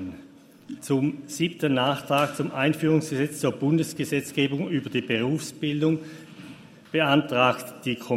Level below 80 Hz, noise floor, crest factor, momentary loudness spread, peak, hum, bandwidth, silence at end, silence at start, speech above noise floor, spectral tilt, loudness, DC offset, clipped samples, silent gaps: -66 dBFS; -49 dBFS; 20 dB; 17 LU; -6 dBFS; none; 16 kHz; 0 s; 0 s; 25 dB; -5.5 dB/octave; -25 LUFS; under 0.1%; under 0.1%; none